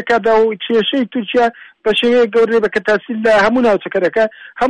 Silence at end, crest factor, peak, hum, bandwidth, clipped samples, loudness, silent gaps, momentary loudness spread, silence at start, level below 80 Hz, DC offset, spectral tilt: 0 s; 8 dB; -6 dBFS; none; 10 kHz; under 0.1%; -14 LUFS; none; 5 LU; 0 s; -48 dBFS; under 0.1%; -5 dB/octave